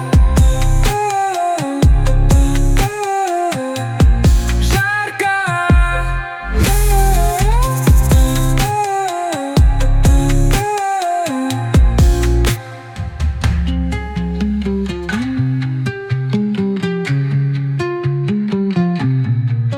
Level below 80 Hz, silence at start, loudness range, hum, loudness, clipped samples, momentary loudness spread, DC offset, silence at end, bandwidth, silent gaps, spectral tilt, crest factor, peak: -16 dBFS; 0 s; 4 LU; none; -16 LUFS; under 0.1%; 7 LU; under 0.1%; 0 s; 18.5 kHz; none; -6 dB/octave; 10 dB; -2 dBFS